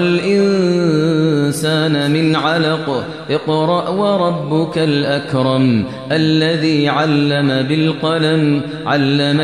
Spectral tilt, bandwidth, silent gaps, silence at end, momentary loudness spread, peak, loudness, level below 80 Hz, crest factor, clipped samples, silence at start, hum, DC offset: -6.5 dB/octave; 13 kHz; none; 0 s; 4 LU; -2 dBFS; -15 LUFS; -56 dBFS; 12 dB; under 0.1%; 0 s; none; 0.2%